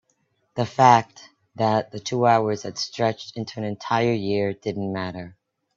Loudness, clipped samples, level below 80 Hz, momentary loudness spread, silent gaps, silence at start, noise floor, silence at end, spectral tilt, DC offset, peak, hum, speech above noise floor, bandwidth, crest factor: -23 LUFS; under 0.1%; -64 dBFS; 16 LU; none; 0.55 s; -69 dBFS; 0.45 s; -5.5 dB/octave; under 0.1%; -2 dBFS; none; 47 dB; 7.6 kHz; 22 dB